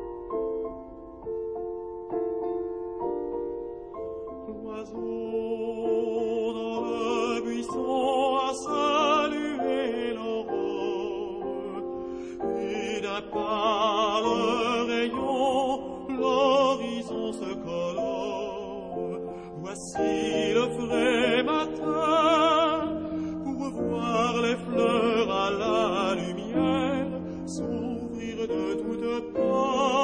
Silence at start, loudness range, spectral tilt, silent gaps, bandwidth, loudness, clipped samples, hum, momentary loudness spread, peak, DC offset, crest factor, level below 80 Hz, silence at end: 0 s; 8 LU; -5 dB/octave; none; 10 kHz; -28 LUFS; under 0.1%; none; 11 LU; -10 dBFS; under 0.1%; 16 dB; -56 dBFS; 0 s